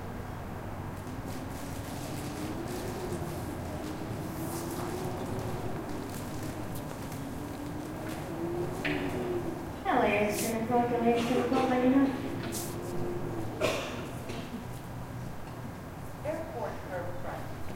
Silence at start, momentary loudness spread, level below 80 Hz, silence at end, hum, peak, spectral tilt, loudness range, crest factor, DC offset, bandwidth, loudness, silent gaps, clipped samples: 0 s; 13 LU; -50 dBFS; 0 s; none; -14 dBFS; -5.5 dB/octave; 10 LU; 20 dB; under 0.1%; 17 kHz; -34 LUFS; none; under 0.1%